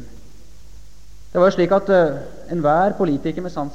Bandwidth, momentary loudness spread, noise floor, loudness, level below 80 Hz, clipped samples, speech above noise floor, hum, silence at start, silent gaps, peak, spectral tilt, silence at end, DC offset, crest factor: 8.8 kHz; 11 LU; -45 dBFS; -18 LUFS; -44 dBFS; under 0.1%; 27 dB; none; 0 s; none; -4 dBFS; -7.5 dB/octave; 0 s; 2%; 16 dB